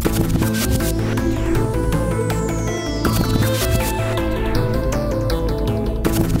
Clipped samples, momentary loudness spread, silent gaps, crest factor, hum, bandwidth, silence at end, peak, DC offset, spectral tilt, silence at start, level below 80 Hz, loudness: under 0.1%; 3 LU; none; 16 dB; none; 16.5 kHz; 0 s; -4 dBFS; under 0.1%; -6 dB/octave; 0 s; -24 dBFS; -20 LUFS